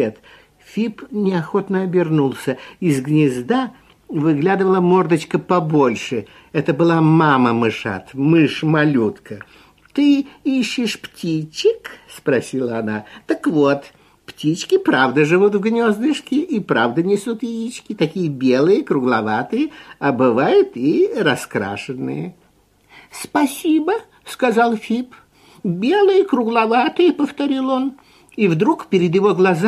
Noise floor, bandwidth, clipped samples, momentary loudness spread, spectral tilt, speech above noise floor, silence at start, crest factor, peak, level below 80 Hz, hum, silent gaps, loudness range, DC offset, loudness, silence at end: -56 dBFS; 14 kHz; under 0.1%; 11 LU; -6.5 dB/octave; 39 dB; 0 s; 16 dB; -2 dBFS; -60 dBFS; none; none; 4 LU; under 0.1%; -18 LUFS; 0 s